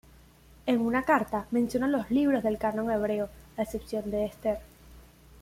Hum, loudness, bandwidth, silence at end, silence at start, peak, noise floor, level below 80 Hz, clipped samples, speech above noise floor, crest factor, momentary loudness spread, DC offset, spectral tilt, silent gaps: 60 Hz at -55 dBFS; -29 LUFS; 16 kHz; 0.4 s; 0.65 s; -12 dBFS; -55 dBFS; -54 dBFS; under 0.1%; 28 dB; 18 dB; 9 LU; under 0.1%; -6.5 dB/octave; none